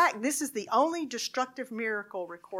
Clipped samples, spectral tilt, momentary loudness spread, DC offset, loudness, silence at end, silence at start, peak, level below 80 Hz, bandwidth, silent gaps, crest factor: under 0.1%; -2 dB/octave; 8 LU; under 0.1%; -31 LUFS; 0 s; 0 s; -12 dBFS; -86 dBFS; 16.5 kHz; none; 18 dB